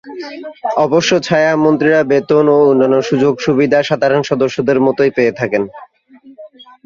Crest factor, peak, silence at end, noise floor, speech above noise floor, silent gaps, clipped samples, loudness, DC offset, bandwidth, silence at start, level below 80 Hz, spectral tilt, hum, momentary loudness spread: 12 dB; 0 dBFS; 0.4 s; -43 dBFS; 30 dB; none; under 0.1%; -13 LUFS; under 0.1%; 7.4 kHz; 0.05 s; -54 dBFS; -5.5 dB/octave; none; 9 LU